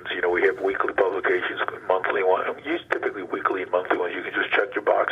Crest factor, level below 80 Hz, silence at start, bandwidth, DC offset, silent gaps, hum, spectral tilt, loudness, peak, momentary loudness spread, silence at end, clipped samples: 18 dB; -64 dBFS; 0 s; 7.4 kHz; under 0.1%; none; none; -5.5 dB/octave; -24 LUFS; -6 dBFS; 5 LU; 0 s; under 0.1%